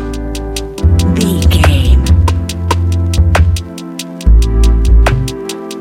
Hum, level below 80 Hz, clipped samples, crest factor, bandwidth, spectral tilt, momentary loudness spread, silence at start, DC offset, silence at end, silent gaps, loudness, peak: none; -12 dBFS; 0.1%; 10 dB; 15.5 kHz; -6 dB/octave; 11 LU; 0 s; under 0.1%; 0 s; none; -12 LUFS; 0 dBFS